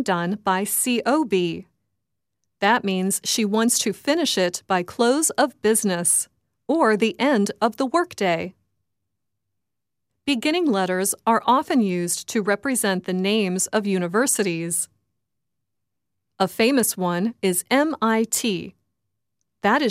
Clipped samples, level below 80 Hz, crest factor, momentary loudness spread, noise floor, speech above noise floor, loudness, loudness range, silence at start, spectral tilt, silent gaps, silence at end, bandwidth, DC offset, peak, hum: under 0.1%; -68 dBFS; 16 dB; 6 LU; -85 dBFS; 63 dB; -21 LUFS; 4 LU; 0 s; -3.5 dB/octave; none; 0 s; 16 kHz; under 0.1%; -6 dBFS; none